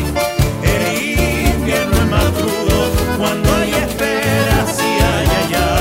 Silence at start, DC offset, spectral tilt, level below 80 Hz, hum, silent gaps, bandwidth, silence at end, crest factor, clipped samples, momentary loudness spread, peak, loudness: 0 s; under 0.1%; -5 dB/octave; -22 dBFS; none; none; 16.5 kHz; 0 s; 14 dB; under 0.1%; 3 LU; 0 dBFS; -15 LUFS